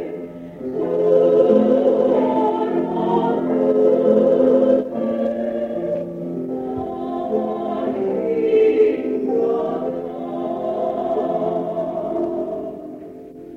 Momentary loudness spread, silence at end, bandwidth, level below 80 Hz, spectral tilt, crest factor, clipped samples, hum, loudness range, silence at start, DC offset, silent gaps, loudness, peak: 13 LU; 0 s; 5.6 kHz; -56 dBFS; -9 dB/octave; 16 dB; under 0.1%; none; 7 LU; 0 s; under 0.1%; none; -19 LUFS; -2 dBFS